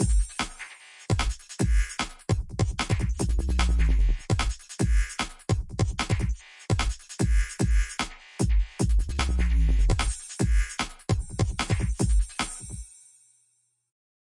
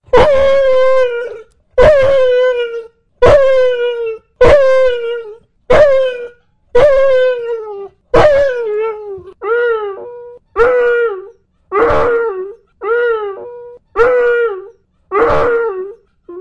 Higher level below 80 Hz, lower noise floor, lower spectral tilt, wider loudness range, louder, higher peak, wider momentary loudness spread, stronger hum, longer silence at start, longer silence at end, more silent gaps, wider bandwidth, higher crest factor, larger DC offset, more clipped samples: about the same, -28 dBFS vs -32 dBFS; first, -70 dBFS vs -39 dBFS; about the same, -5 dB/octave vs -5.5 dB/octave; second, 2 LU vs 5 LU; second, -28 LUFS vs -12 LUFS; second, -10 dBFS vs 0 dBFS; second, 7 LU vs 19 LU; neither; about the same, 0 s vs 0 s; first, 1.55 s vs 0 s; neither; first, 11.5 kHz vs 9.2 kHz; about the same, 16 dB vs 12 dB; second, under 0.1% vs 2%; neither